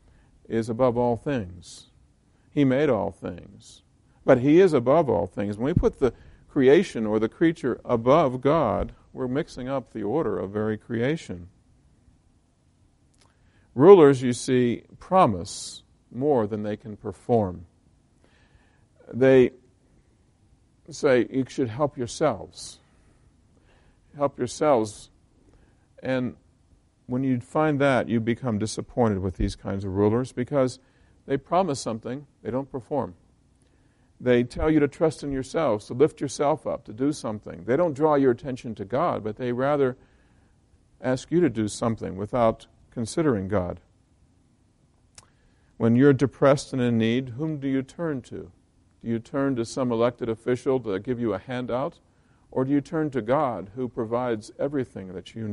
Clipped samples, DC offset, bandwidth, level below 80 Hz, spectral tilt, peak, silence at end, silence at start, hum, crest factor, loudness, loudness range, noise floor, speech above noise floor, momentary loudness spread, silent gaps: under 0.1%; under 0.1%; 11.5 kHz; -48 dBFS; -6.5 dB/octave; -2 dBFS; 0 s; 0.5 s; none; 24 dB; -24 LUFS; 8 LU; -63 dBFS; 39 dB; 14 LU; none